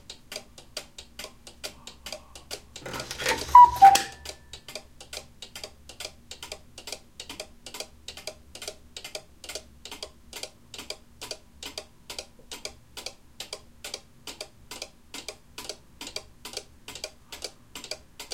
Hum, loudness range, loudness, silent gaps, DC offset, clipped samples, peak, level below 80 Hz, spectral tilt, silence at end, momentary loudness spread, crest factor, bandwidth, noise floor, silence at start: none; 19 LU; -20 LUFS; none; 0.1%; under 0.1%; -2 dBFS; -54 dBFS; -1.5 dB/octave; 0 s; 14 LU; 26 dB; 17 kHz; -45 dBFS; 0.1 s